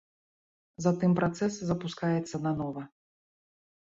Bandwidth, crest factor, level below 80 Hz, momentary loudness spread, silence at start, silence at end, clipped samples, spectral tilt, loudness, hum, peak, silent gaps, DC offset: 7.8 kHz; 20 dB; -64 dBFS; 10 LU; 0.8 s; 1.1 s; under 0.1%; -7 dB/octave; -30 LUFS; none; -12 dBFS; none; under 0.1%